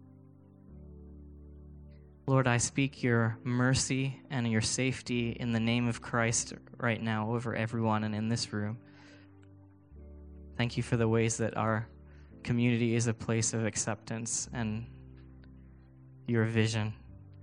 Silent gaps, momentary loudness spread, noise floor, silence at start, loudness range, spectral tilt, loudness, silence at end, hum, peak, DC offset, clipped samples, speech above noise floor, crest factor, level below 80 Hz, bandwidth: none; 23 LU; -56 dBFS; 0 s; 5 LU; -5 dB/octave; -31 LUFS; 0 s; none; -12 dBFS; under 0.1%; under 0.1%; 26 dB; 22 dB; -56 dBFS; 10.5 kHz